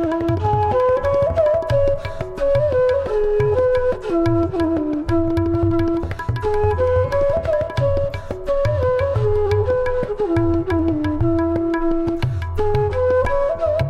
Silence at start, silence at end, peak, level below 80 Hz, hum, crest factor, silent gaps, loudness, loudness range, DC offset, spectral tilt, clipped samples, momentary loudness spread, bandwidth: 0 s; 0 s; -6 dBFS; -30 dBFS; none; 12 dB; none; -19 LUFS; 2 LU; under 0.1%; -9 dB/octave; under 0.1%; 5 LU; 10.5 kHz